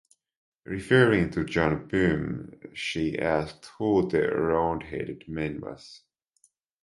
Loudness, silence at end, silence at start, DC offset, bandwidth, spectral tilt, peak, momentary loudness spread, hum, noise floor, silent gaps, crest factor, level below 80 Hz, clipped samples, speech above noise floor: -26 LUFS; 0.85 s; 0.7 s; under 0.1%; 11.5 kHz; -6.5 dB/octave; -4 dBFS; 16 LU; none; -68 dBFS; none; 22 dB; -50 dBFS; under 0.1%; 41 dB